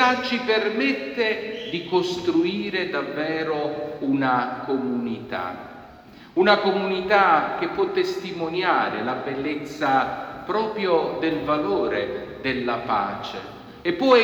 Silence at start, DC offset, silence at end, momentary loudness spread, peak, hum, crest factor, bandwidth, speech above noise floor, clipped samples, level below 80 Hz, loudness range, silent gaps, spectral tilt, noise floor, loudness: 0 s; under 0.1%; 0 s; 11 LU; -2 dBFS; none; 20 dB; 19 kHz; 23 dB; under 0.1%; -58 dBFS; 4 LU; none; -5.5 dB/octave; -46 dBFS; -23 LUFS